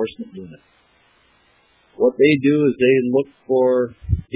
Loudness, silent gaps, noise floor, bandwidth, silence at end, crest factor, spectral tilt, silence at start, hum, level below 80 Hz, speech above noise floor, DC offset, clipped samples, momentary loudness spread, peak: -18 LUFS; none; -58 dBFS; 4 kHz; 0.15 s; 16 dB; -11 dB/octave; 0 s; none; -38 dBFS; 40 dB; under 0.1%; under 0.1%; 15 LU; -4 dBFS